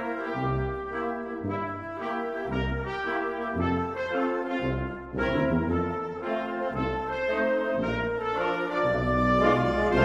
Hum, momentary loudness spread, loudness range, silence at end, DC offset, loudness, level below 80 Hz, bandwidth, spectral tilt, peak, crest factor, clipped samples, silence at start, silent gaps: none; 8 LU; 5 LU; 0 s; under 0.1%; -28 LUFS; -42 dBFS; 11.5 kHz; -7.5 dB/octave; -10 dBFS; 18 dB; under 0.1%; 0 s; none